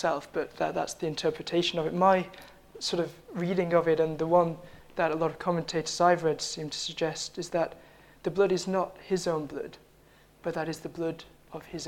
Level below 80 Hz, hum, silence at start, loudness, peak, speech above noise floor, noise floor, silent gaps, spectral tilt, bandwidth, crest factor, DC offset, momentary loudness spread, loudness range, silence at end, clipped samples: -62 dBFS; none; 0 s; -29 LUFS; -10 dBFS; 30 dB; -59 dBFS; none; -4.5 dB/octave; 16.5 kHz; 20 dB; under 0.1%; 14 LU; 5 LU; 0 s; under 0.1%